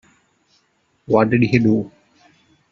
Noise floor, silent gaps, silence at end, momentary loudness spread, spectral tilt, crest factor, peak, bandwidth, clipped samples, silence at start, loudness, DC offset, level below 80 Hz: -64 dBFS; none; 0.85 s; 7 LU; -7 dB/octave; 20 dB; -2 dBFS; 7.2 kHz; under 0.1%; 1.1 s; -17 LUFS; under 0.1%; -54 dBFS